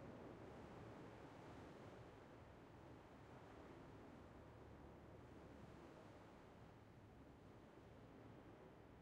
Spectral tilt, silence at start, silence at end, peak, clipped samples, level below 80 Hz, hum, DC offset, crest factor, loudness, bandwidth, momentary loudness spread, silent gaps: -7 dB/octave; 0 s; 0 s; -48 dBFS; under 0.1%; -74 dBFS; none; under 0.1%; 14 dB; -62 LUFS; 10 kHz; 5 LU; none